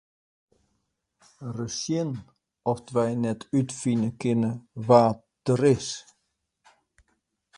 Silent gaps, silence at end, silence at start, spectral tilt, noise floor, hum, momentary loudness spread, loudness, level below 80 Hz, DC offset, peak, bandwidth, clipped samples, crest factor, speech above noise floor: none; 1.55 s; 1.4 s; -6.5 dB/octave; -77 dBFS; none; 15 LU; -26 LUFS; -62 dBFS; under 0.1%; -4 dBFS; 11.5 kHz; under 0.1%; 24 dB; 52 dB